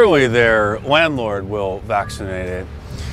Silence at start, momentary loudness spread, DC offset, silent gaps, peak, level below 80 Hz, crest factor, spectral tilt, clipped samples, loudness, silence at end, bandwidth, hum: 0 s; 14 LU; under 0.1%; none; 0 dBFS; -36 dBFS; 16 dB; -5.5 dB/octave; under 0.1%; -17 LUFS; 0 s; 14 kHz; none